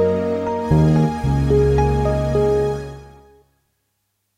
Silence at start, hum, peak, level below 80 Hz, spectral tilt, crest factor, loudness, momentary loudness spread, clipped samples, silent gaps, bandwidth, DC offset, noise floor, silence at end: 0 s; none; -6 dBFS; -28 dBFS; -8.5 dB/octave; 14 dB; -18 LUFS; 8 LU; under 0.1%; none; 11.5 kHz; under 0.1%; -71 dBFS; 1.3 s